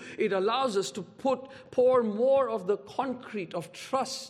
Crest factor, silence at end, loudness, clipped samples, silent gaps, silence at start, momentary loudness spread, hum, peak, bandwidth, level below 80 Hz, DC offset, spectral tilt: 14 dB; 0 s; -29 LUFS; under 0.1%; none; 0 s; 12 LU; none; -14 dBFS; 13.5 kHz; -74 dBFS; under 0.1%; -4.5 dB/octave